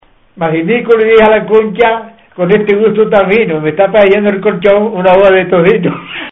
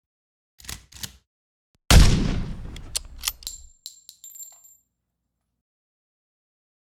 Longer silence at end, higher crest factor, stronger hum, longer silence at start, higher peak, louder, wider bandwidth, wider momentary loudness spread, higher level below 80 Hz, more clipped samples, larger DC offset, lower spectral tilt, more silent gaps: second, 0 s vs 2.45 s; second, 8 dB vs 24 dB; second, none vs 60 Hz at -50 dBFS; second, 0.35 s vs 0.7 s; about the same, 0 dBFS vs -2 dBFS; first, -9 LUFS vs -22 LUFS; second, 4 kHz vs 18.5 kHz; second, 8 LU vs 25 LU; second, -42 dBFS vs -28 dBFS; first, 0.2% vs under 0.1%; neither; first, -8.5 dB/octave vs -4 dB/octave; second, none vs 1.27-1.74 s